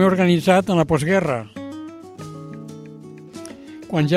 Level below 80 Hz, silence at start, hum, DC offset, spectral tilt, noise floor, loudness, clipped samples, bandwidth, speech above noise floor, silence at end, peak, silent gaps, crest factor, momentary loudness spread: -52 dBFS; 0 s; none; under 0.1%; -6.5 dB/octave; -39 dBFS; -18 LUFS; under 0.1%; 14.5 kHz; 22 dB; 0 s; -2 dBFS; none; 18 dB; 22 LU